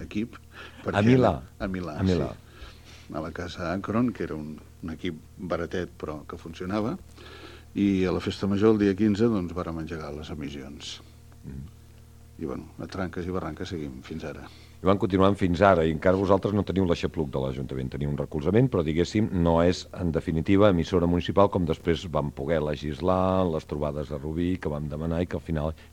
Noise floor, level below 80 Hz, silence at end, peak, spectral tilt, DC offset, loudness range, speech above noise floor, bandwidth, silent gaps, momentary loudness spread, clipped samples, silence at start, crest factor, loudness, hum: -50 dBFS; -44 dBFS; 0.05 s; -4 dBFS; -7.5 dB/octave; 0.1%; 12 LU; 24 dB; 15.5 kHz; none; 17 LU; under 0.1%; 0 s; 24 dB; -26 LUFS; none